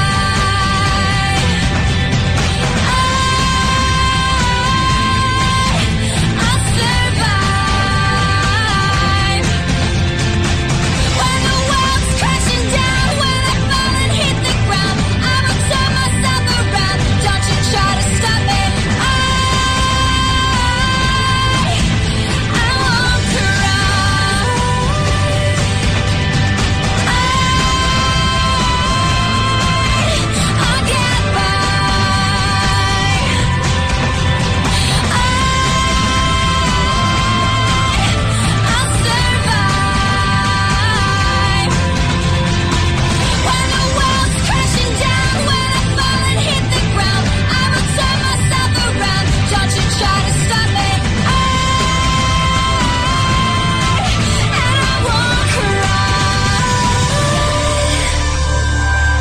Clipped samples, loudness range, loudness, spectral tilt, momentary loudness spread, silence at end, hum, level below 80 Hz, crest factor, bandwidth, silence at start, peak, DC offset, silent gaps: under 0.1%; 1 LU; -14 LUFS; -4 dB/octave; 2 LU; 0 s; none; -22 dBFS; 12 dB; 14.5 kHz; 0 s; -2 dBFS; 2%; none